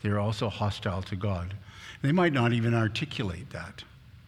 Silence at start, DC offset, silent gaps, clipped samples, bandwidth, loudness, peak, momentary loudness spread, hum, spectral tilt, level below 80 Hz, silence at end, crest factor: 0.05 s; under 0.1%; none; under 0.1%; 11.5 kHz; -29 LUFS; -10 dBFS; 18 LU; none; -7 dB/octave; -54 dBFS; 0.05 s; 18 dB